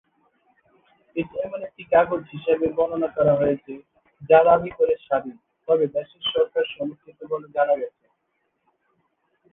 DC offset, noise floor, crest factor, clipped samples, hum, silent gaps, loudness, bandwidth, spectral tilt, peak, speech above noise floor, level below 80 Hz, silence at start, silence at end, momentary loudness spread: under 0.1%; -73 dBFS; 22 dB; under 0.1%; none; none; -22 LUFS; 3.8 kHz; -9 dB/octave; -2 dBFS; 52 dB; -58 dBFS; 1.15 s; 1.65 s; 15 LU